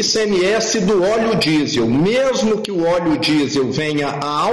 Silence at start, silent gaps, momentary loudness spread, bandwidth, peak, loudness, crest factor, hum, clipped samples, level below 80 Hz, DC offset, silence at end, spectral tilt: 0 s; none; 3 LU; 11.5 kHz; -8 dBFS; -16 LUFS; 8 dB; none; under 0.1%; -48 dBFS; under 0.1%; 0 s; -4.5 dB/octave